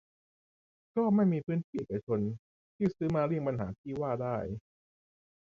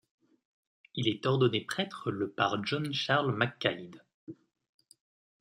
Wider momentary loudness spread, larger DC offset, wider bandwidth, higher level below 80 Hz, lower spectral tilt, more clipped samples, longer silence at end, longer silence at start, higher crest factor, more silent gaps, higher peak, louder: second, 10 LU vs 23 LU; neither; second, 7 kHz vs 13.5 kHz; first, -60 dBFS vs -74 dBFS; first, -10 dB/octave vs -5.5 dB/octave; neither; about the same, 1 s vs 1.05 s; about the same, 0.95 s vs 0.95 s; second, 16 dB vs 24 dB; first, 1.64-1.73 s, 2.03-2.07 s, 2.39-2.79 s, 3.78-3.84 s vs 4.14-4.27 s; second, -18 dBFS vs -10 dBFS; about the same, -33 LUFS vs -31 LUFS